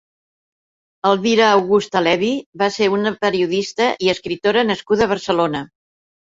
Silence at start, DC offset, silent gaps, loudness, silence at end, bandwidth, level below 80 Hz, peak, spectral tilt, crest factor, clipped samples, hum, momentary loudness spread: 1.05 s; under 0.1%; 2.46-2.53 s; -17 LUFS; 0.75 s; 7.8 kHz; -56 dBFS; -2 dBFS; -4.5 dB/octave; 16 dB; under 0.1%; none; 7 LU